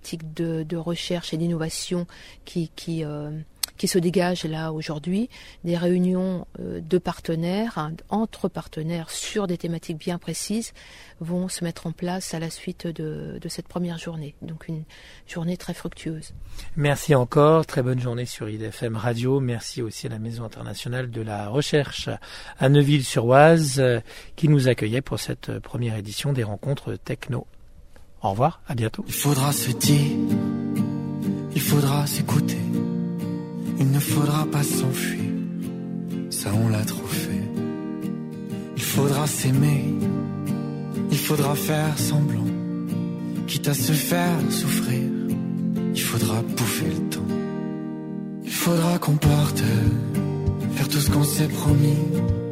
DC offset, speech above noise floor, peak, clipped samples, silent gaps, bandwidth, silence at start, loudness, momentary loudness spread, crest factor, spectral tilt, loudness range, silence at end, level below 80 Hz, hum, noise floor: under 0.1%; 21 dB; -2 dBFS; under 0.1%; none; 16 kHz; 0 s; -24 LUFS; 12 LU; 20 dB; -5.5 dB/octave; 9 LU; 0 s; -46 dBFS; none; -45 dBFS